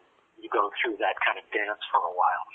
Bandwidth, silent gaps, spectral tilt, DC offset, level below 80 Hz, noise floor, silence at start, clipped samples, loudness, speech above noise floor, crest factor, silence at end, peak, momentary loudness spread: 4 kHz; none; -4.5 dB/octave; under 0.1%; -78 dBFS; -48 dBFS; 0.4 s; under 0.1%; -27 LUFS; 21 dB; 20 dB; 0 s; -10 dBFS; 4 LU